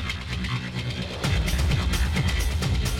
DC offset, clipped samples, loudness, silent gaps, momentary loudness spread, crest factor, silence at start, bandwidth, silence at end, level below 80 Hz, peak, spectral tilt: under 0.1%; under 0.1%; -26 LUFS; none; 6 LU; 16 dB; 0 s; 17 kHz; 0 s; -28 dBFS; -8 dBFS; -4.5 dB/octave